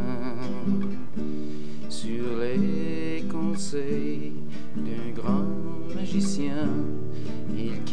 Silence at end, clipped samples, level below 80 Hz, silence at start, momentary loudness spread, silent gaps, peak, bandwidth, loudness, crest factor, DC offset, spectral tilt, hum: 0 s; under 0.1%; -60 dBFS; 0 s; 8 LU; none; -12 dBFS; 10 kHz; -30 LUFS; 16 dB; 8%; -6.5 dB/octave; none